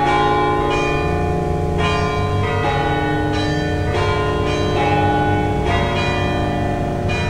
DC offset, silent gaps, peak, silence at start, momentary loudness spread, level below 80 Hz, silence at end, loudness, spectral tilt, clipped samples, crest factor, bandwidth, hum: 1%; none; -4 dBFS; 0 s; 4 LU; -30 dBFS; 0 s; -18 LUFS; -6.5 dB/octave; under 0.1%; 12 dB; 11.5 kHz; none